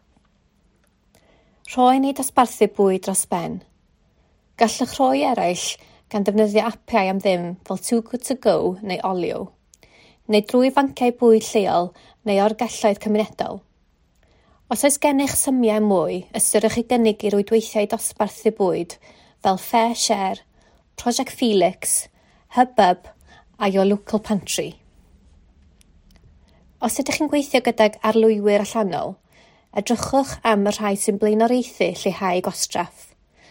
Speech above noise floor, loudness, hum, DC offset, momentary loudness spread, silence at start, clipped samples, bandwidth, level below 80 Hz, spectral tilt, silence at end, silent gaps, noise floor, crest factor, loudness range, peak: 41 dB; -20 LUFS; none; under 0.1%; 10 LU; 1.65 s; under 0.1%; 16.5 kHz; -56 dBFS; -4 dB/octave; 0.45 s; none; -61 dBFS; 20 dB; 4 LU; 0 dBFS